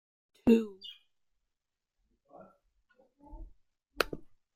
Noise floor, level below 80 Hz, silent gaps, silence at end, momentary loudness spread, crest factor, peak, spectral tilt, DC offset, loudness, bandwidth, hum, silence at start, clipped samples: -88 dBFS; -58 dBFS; none; 0.3 s; 27 LU; 30 dB; -8 dBFS; -5.5 dB/octave; under 0.1%; -31 LUFS; 15.5 kHz; none; 0.45 s; under 0.1%